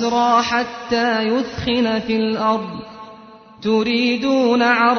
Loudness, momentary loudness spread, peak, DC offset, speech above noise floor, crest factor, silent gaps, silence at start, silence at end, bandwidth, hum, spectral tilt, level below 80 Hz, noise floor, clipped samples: -18 LUFS; 11 LU; -2 dBFS; under 0.1%; 25 dB; 16 dB; none; 0 s; 0 s; 6.6 kHz; none; -4.5 dB/octave; -50 dBFS; -42 dBFS; under 0.1%